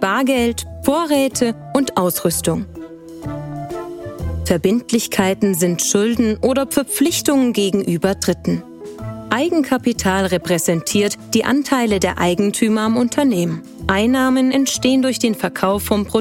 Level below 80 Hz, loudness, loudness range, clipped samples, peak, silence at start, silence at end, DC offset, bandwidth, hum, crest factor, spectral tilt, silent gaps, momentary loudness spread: -40 dBFS; -17 LUFS; 4 LU; under 0.1%; -2 dBFS; 0 s; 0 s; under 0.1%; 16.5 kHz; none; 16 dB; -4.5 dB/octave; none; 12 LU